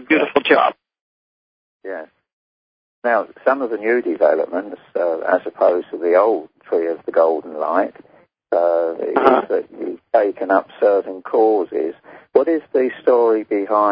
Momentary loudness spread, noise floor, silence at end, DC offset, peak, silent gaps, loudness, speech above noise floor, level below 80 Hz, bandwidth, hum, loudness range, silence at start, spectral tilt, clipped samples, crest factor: 10 LU; under -90 dBFS; 0 s; under 0.1%; 0 dBFS; 1.01-1.80 s, 2.33-3.02 s; -18 LUFS; over 73 dB; -68 dBFS; 5.2 kHz; none; 4 LU; 0 s; -8 dB/octave; under 0.1%; 18 dB